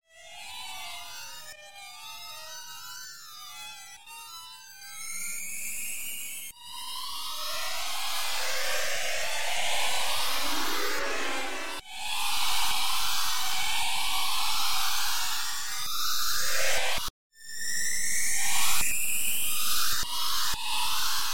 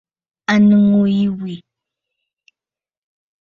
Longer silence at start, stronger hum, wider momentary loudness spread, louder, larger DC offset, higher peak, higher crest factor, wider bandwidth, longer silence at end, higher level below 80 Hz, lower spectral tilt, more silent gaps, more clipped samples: second, 0 s vs 0.5 s; neither; about the same, 15 LU vs 17 LU; second, -29 LUFS vs -14 LUFS; first, 4% vs under 0.1%; second, -10 dBFS vs -2 dBFS; about the same, 16 dB vs 16 dB; first, 17 kHz vs 7 kHz; second, 0 s vs 1.85 s; about the same, -52 dBFS vs -56 dBFS; second, 0.5 dB/octave vs -7.5 dB/octave; first, 17.10-17.30 s vs none; neither